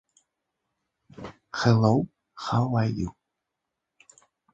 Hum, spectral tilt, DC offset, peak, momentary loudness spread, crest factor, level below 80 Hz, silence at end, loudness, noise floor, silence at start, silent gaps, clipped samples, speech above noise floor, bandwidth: none; -7 dB/octave; under 0.1%; -6 dBFS; 22 LU; 22 dB; -54 dBFS; 1.4 s; -25 LUFS; -84 dBFS; 1.2 s; none; under 0.1%; 61 dB; 7.8 kHz